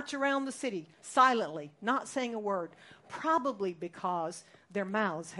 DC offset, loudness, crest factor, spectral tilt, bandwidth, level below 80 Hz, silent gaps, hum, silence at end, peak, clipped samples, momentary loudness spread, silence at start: under 0.1%; -32 LUFS; 22 dB; -4 dB/octave; 11.5 kHz; -82 dBFS; none; none; 0 s; -12 dBFS; under 0.1%; 14 LU; 0 s